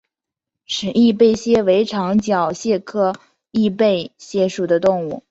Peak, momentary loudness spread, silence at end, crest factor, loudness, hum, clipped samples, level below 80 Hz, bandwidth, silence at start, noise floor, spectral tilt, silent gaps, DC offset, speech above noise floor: -2 dBFS; 9 LU; 0.1 s; 16 dB; -18 LUFS; none; under 0.1%; -54 dBFS; 8 kHz; 0.7 s; -84 dBFS; -5.5 dB/octave; none; under 0.1%; 67 dB